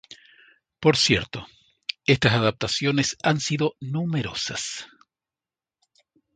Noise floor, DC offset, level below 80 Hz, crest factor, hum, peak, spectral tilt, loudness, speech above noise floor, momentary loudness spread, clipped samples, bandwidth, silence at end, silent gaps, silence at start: under -90 dBFS; under 0.1%; -52 dBFS; 24 dB; none; 0 dBFS; -4 dB/octave; -23 LUFS; over 67 dB; 14 LU; under 0.1%; 9.4 kHz; 1.5 s; none; 0.1 s